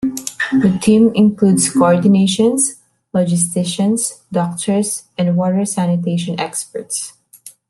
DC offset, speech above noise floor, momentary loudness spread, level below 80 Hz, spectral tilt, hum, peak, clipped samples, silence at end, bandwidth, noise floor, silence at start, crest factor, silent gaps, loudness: under 0.1%; 28 dB; 10 LU; -54 dBFS; -5 dB/octave; none; 0 dBFS; under 0.1%; 0.2 s; 12.5 kHz; -42 dBFS; 0 s; 14 dB; none; -15 LUFS